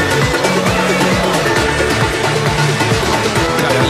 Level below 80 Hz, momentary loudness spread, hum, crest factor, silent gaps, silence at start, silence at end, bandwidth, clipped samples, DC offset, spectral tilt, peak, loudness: -30 dBFS; 1 LU; none; 12 dB; none; 0 s; 0 s; 16 kHz; under 0.1%; under 0.1%; -4.5 dB/octave; -2 dBFS; -13 LUFS